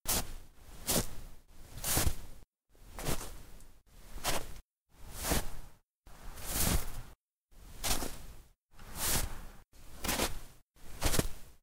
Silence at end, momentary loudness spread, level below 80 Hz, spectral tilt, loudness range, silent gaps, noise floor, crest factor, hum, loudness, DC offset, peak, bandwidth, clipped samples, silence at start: 0.1 s; 23 LU; -42 dBFS; -2.5 dB/octave; 4 LU; 2.47-2.51 s, 4.64-4.69 s, 4.77-4.85 s, 5.85-5.99 s, 7.21-7.41 s, 8.62-8.67 s, 10.62-10.74 s; -59 dBFS; 22 dB; none; -35 LUFS; under 0.1%; -14 dBFS; 16 kHz; under 0.1%; 0.05 s